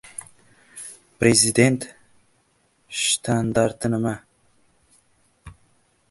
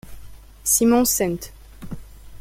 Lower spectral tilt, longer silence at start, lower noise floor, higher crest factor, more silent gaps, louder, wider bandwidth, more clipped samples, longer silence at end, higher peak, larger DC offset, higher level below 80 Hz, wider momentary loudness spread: about the same, -4 dB/octave vs -3.5 dB/octave; first, 0.75 s vs 0.05 s; first, -64 dBFS vs -40 dBFS; first, 24 dB vs 18 dB; neither; about the same, -20 LUFS vs -19 LUFS; second, 12 kHz vs 16.5 kHz; neither; first, 0.6 s vs 0 s; about the same, -2 dBFS vs -4 dBFS; neither; second, -54 dBFS vs -42 dBFS; about the same, 22 LU vs 23 LU